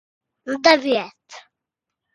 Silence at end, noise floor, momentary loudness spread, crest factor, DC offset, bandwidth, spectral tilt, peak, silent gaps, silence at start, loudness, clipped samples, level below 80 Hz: 0.75 s; -84 dBFS; 20 LU; 22 dB; under 0.1%; 11.5 kHz; -2.5 dB/octave; 0 dBFS; none; 0.45 s; -18 LUFS; under 0.1%; -66 dBFS